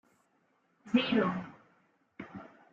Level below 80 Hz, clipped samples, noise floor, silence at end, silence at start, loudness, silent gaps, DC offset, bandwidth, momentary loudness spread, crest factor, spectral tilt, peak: -74 dBFS; under 0.1%; -73 dBFS; 0.25 s; 0.85 s; -31 LUFS; none; under 0.1%; 7.4 kHz; 22 LU; 20 dB; -7 dB/octave; -14 dBFS